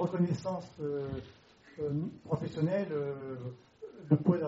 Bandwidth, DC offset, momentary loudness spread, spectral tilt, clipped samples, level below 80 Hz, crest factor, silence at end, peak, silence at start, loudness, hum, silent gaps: 7.6 kHz; under 0.1%; 18 LU; -9 dB/octave; under 0.1%; -64 dBFS; 22 dB; 0 s; -12 dBFS; 0 s; -35 LUFS; none; none